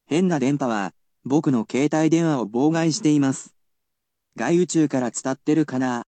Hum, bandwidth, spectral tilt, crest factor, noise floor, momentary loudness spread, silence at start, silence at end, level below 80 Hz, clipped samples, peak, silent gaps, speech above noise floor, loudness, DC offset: none; 9.2 kHz; -6 dB/octave; 16 dB; -81 dBFS; 7 LU; 0.1 s; 0.05 s; -72 dBFS; under 0.1%; -6 dBFS; none; 61 dB; -21 LUFS; under 0.1%